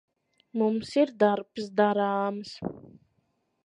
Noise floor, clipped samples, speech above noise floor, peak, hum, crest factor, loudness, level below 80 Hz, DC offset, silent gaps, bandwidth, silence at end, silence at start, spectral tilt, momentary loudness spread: -74 dBFS; under 0.1%; 47 dB; -10 dBFS; none; 18 dB; -27 LUFS; -68 dBFS; under 0.1%; none; 11 kHz; 0.85 s; 0.55 s; -6.5 dB/octave; 13 LU